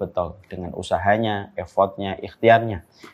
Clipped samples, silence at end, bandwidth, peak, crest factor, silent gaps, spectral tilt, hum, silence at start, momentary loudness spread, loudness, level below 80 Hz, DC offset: under 0.1%; 0.05 s; 10 kHz; -2 dBFS; 20 dB; none; -6.5 dB/octave; none; 0 s; 15 LU; -22 LUFS; -50 dBFS; under 0.1%